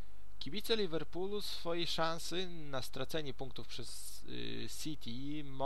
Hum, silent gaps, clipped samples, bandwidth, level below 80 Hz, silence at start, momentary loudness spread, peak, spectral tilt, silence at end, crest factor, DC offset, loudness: none; none; under 0.1%; 16.5 kHz; -58 dBFS; 0 s; 11 LU; -18 dBFS; -4 dB/octave; 0 s; 22 dB; 2%; -41 LUFS